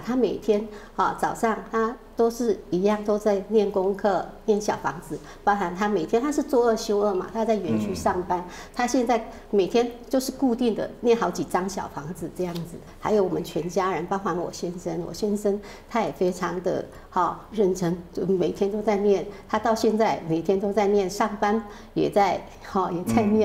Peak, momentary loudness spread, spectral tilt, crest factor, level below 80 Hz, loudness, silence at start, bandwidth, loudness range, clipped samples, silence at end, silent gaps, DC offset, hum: -8 dBFS; 9 LU; -5.5 dB/octave; 16 dB; -50 dBFS; -25 LUFS; 0 s; 16 kHz; 4 LU; under 0.1%; 0 s; none; under 0.1%; none